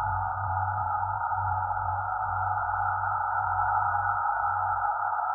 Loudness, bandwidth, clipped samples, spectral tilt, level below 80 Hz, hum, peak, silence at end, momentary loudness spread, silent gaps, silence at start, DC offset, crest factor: -28 LUFS; 1.9 kHz; under 0.1%; -11.5 dB/octave; -50 dBFS; none; -14 dBFS; 0 s; 3 LU; none; 0 s; under 0.1%; 14 dB